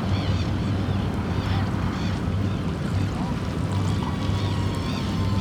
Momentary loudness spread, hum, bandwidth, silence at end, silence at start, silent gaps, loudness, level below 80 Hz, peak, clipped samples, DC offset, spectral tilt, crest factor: 2 LU; none; 12 kHz; 0 s; 0 s; none; -26 LUFS; -36 dBFS; -12 dBFS; under 0.1%; under 0.1%; -7 dB/octave; 12 dB